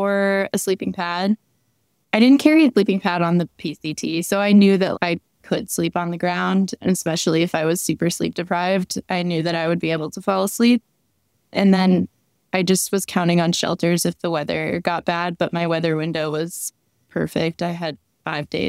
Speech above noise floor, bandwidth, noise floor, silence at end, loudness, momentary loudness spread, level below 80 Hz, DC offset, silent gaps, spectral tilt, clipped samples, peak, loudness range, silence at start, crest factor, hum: 48 dB; 16 kHz; -68 dBFS; 0 s; -20 LUFS; 11 LU; -60 dBFS; under 0.1%; none; -5 dB/octave; under 0.1%; 0 dBFS; 5 LU; 0 s; 20 dB; none